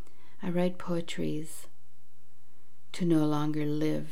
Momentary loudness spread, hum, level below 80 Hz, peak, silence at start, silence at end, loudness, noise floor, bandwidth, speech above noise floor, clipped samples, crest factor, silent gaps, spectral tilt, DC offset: 15 LU; none; -70 dBFS; -16 dBFS; 0.4 s; 0 s; -31 LUFS; -67 dBFS; 16 kHz; 37 dB; under 0.1%; 16 dB; none; -7 dB/octave; 3%